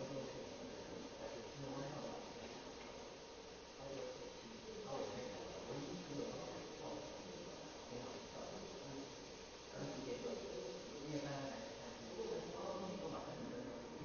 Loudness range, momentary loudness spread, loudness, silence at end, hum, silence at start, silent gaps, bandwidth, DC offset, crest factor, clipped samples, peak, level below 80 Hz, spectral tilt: 3 LU; 6 LU; -50 LUFS; 0 s; none; 0 s; none; 6.8 kHz; under 0.1%; 18 dB; under 0.1%; -32 dBFS; -70 dBFS; -4 dB/octave